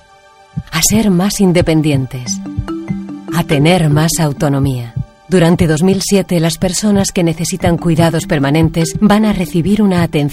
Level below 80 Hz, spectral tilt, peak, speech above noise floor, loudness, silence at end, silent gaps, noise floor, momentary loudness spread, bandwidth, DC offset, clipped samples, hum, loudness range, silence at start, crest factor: -32 dBFS; -5.5 dB/octave; 0 dBFS; 32 dB; -13 LUFS; 0 s; none; -43 dBFS; 11 LU; 16.5 kHz; under 0.1%; under 0.1%; none; 2 LU; 0.55 s; 12 dB